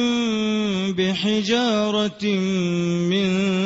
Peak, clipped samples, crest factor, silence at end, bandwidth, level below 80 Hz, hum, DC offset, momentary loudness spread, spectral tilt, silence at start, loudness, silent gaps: -8 dBFS; under 0.1%; 12 dB; 0 s; 8 kHz; -58 dBFS; none; under 0.1%; 3 LU; -5.5 dB/octave; 0 s; -21 LUFS; none